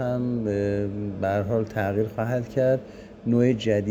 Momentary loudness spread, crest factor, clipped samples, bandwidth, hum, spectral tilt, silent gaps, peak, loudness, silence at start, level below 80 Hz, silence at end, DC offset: 7 LU; 16 dB; under 0.1%; 16 kHz; none; -8 dB/octave; none; -8 dBFS; -25 LUFS; 0 s; -52 dBFS; 0 s; under 0.1%